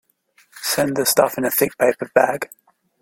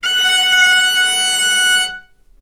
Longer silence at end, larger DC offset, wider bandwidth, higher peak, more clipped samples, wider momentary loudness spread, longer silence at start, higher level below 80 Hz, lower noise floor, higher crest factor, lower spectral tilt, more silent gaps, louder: first, 0.55 s vs 0.4 s; neither; second, 17 kHz vs 19.5 kHz; about the same, -2 dBFS vs 0 dBFS; neither; first, 10 LU vs 4 LU; first, 0.55 s vs 0.05 s; second, -62 dBFS vs -52 dBFS; first, -58 dBFS vs -36 dBFS; about the same, 18 dB vs 14 dB; first, -3 dB/octave vs 3.5 dB/octave; neither; second, -19 LUFS vs -11 LUFS